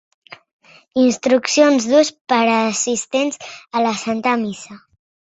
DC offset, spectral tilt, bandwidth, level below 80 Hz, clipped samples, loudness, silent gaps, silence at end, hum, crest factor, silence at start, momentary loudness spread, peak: under 0.1%; -3 dB/octave; 8.2 kHz; -64 dBFS; under 0.1%; -17 LUFS; 2.21-2.25 s; 0.6 s; none; 18 dB; 0.95 s; 11 LU; 0 dBFS